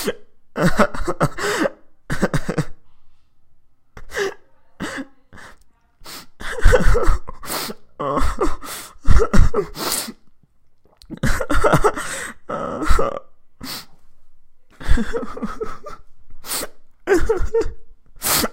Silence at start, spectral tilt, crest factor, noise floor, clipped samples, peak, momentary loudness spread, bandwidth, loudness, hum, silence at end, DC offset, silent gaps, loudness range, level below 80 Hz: 0 s; -4.5 dB/octave; 18 dB; -50 dBFS; under 0.1%; 0 dBFS; 18 LU; 16 kHz; -22 LUFS; none; 0 s; under 0.1%; none; 8 LU; -24 dBFS